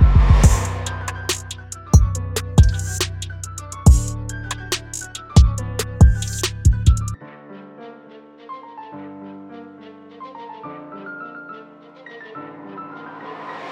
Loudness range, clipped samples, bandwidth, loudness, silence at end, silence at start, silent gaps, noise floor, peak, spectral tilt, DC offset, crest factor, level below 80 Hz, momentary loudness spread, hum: 18 LU; under 0.1%; 16 kHz; -19 LUFS; 0 s; 0 s; none; -43 dBFS; 0 dBFS; -5 dB/octave; under 0.1%; 18 dB; -22 dBFS; 23 LU; none